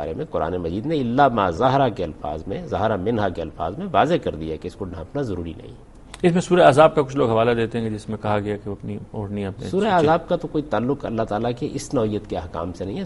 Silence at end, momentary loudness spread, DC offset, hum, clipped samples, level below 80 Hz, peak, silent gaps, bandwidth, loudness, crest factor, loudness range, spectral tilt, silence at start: 0 s; 13 LU; under 0.1%; none; under 0.1%; -44 dBFS; 0 dBFS; none; 11.5 kHz; -22 LUFS; 20 dB; 5 LU; -6.5 dB/octave; 0 s